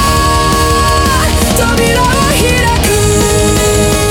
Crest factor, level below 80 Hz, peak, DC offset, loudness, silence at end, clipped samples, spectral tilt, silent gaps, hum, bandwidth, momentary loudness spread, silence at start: 10 dB; -18 dBFS; 0 dBFS; under 0.1%; -9 LUFS; 0 s; under 0.1%; -4 dB/octave; none; none; 18 kHz; 1 LU; 0 s